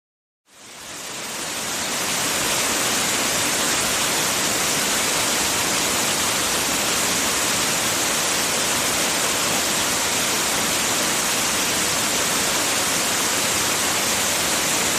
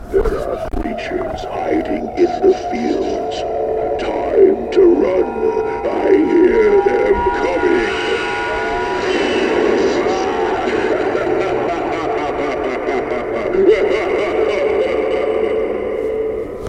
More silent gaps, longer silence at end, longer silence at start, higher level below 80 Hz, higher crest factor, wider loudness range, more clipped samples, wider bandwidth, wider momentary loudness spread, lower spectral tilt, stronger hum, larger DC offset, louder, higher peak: neither; about the same, 0 s vs 0 s; first, 0.55 s vs 0 s; second, -50 dBFS vs -34 dBFS; about the same, 14 dB vs 16 dB; second, 1 LU vs 4 LU; neither; first, 15.5 kHz vs 9.2 kHz; second, 2 LU vs 8 LU; second, -0.5 dB/octave vs -5.5 dB/octave; neither; neither; second, -19 LUFS vs -16 LUFS; second, -8 dBFS vs 0 dBFS